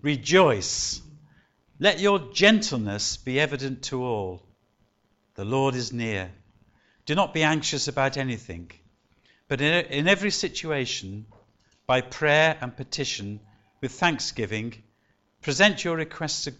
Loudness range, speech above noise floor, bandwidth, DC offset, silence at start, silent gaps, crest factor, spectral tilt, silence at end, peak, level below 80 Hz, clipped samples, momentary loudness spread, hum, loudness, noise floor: 5 LU; 44 dB; 8.2 kHz; under 0.1%; 0.05 s; none; 22 dB; -4 dB/octave; 0.05 s; -6 dBFS; -56 dBFS; under 0.1%; 17 LU; none; -24 LUFS; -69 dBFS